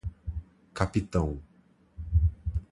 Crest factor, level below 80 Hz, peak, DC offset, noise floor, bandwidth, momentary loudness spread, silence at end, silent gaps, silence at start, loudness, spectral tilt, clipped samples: 22 dB; -34 dBFS; -8 dBFS; under 0.1%; -61 dBFS; 11 kHz; 15 LU; 0.1 s; none; 0.05 s; -31 LUFS; -7.5 dB/octave; under 0.1%